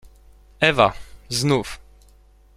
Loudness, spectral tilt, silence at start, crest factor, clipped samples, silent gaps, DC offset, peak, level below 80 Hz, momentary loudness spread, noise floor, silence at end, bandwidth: -20 LUFS; -4.5 dB/octave; 0.6 s; 22 dB; under 0.1%; none; under 0.1%; -2 dBFS; -46 dBFS; 22 LU; -52 dBFS; 0.8 s; 15 kHz